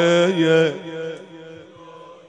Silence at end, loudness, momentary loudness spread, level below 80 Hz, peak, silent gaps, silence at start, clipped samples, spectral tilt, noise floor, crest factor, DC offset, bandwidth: 0.15 s; -19 LUFS; 23 LU; -70 dBFS; -4 dBFS; none; 0 s; under 0.1%; -5.5 dB/octave; -42 dBFS; 16 dB; under 0.1%; 9.4 kHz